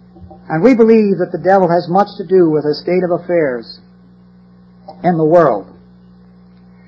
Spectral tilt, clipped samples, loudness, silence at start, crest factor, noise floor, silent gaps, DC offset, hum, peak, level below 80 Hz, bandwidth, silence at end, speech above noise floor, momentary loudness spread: -9 dB/octave; under 0.1%; -13 LUFS; 0.2 s; 14 dB; -43 dBFS; none; under 0.1%; 60 Hz at -40 dBFS; 0 dBFS; -52 dBFS; 7.2 kHz; 1.25 s; 31 dB; 9 LU